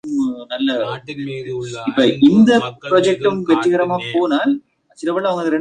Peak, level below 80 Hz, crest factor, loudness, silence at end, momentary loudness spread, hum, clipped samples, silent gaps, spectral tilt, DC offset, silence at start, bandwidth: -2 dBFS; -58 dBFS; 14 dB; -17 LUFS; 0 s; 14 LU; none; under 0.1%; none; -6 dB/octave; under 0.1%; 0.05 s; 9.6 kHz